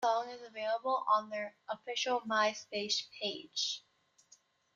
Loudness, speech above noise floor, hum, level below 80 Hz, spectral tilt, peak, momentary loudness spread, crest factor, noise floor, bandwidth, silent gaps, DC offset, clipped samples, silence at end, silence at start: -35 LUFS; 32 dB; none; -86 dBFS; -1.5 dB/octave; -18 dBFS; 10 LU; 18 dB; -67 dBFS; 7.8 kHz; none; under 0.1%; under 0.1%; 0.95 s; 0 s